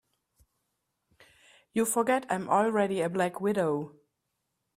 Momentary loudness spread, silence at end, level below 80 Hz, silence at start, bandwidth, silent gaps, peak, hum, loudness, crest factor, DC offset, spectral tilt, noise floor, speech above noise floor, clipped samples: 7 LU; 0.9 s; -72 dBFS; 1.75 s; 15.5 kHz; none; -12 dBFS; none; -28 LUFS; 18 dB; under 0.1%; -5 dB/octave; -82 dBFS; 54 dB; under 0.1%